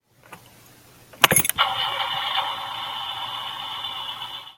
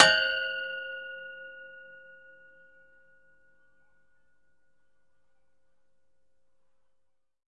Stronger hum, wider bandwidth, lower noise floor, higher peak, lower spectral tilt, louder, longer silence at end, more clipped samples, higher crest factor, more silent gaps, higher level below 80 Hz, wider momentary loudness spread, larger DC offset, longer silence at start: neither; first, 17 kHz vs 10 kHz; second, -51 dBFS vs -80 dBFS; about the same, 0 dBFS vs -2 dBFS; about the same, -1 dB/octave vs -0.5 dB/octave; first, -23 LUFS vs -28 LUFS; second, 0.05 s vs 5.55 s; neither; second, 26 dB vs 32 dB; neither; first, -58 dBFS vs -72 dBFS; second, 13 LU vs 25 LU; neither; first, 0.3 s vs 0 s